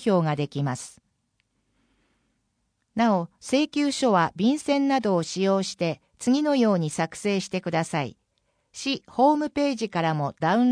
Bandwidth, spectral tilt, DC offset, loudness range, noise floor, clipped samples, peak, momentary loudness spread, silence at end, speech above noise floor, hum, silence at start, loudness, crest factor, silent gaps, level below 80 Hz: 10.5 kHz; -5.5 dB/octave; under 0.1%; 6 LU; -74 dBFS; under 0.1%; -8 dBFS; 8 LU; 0 s; 51 dB; none; 0 s; -24 LUFS; 16 dB; none; -66 dBFS